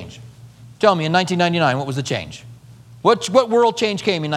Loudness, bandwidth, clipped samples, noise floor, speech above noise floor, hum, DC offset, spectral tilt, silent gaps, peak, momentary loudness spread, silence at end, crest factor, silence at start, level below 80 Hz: -18 LUFS; 13.5 kHz; under 0.1%; -43 dBFS; 25 dB; none; under 0.1%; -5 dB/octave; none; 0 dBFS; 10 LU; 0 s; 18 dB; 0 s; -56 dBFS